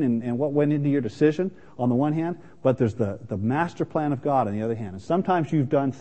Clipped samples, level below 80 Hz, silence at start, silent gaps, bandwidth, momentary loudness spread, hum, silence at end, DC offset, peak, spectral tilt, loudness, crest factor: under 0.1%; -60 dBFS; 0 s; none; 8.6 kHz; 7 LU; none; 0 s; 0.4%; -8 dBFS; -9 dB/octave; -25 LUFS; 16 dB